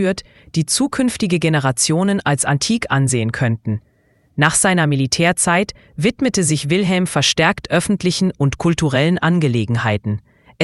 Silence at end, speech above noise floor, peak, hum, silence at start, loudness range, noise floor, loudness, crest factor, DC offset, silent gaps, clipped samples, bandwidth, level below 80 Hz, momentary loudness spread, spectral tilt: 0 s; 34 dB; 0 dBFS; none; 0 s; 1 LU; -51 dBFS; -17 LUFS; 16 dB; under 0.1%; none; under 0.1%; 12 kHz; -46 dBFS; 8 LU; -4.5 dB/octave